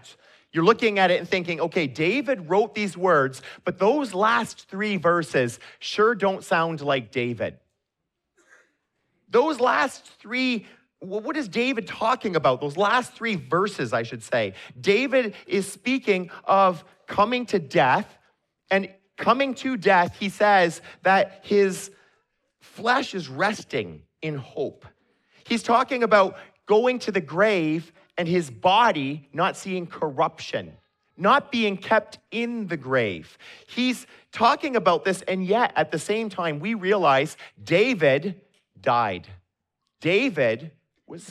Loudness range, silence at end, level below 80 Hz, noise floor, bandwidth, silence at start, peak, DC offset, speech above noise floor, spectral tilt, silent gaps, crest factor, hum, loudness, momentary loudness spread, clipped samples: 4 LU; 0 s; -68 dBFS; -81 dBFS; 13.5 kHz; 0.1 s; -4 dBFS; under 0.1%; 58 dB; -5 dB/octave; none; 20 dB; none; -23 LUFS; 12 LU; under 0.1%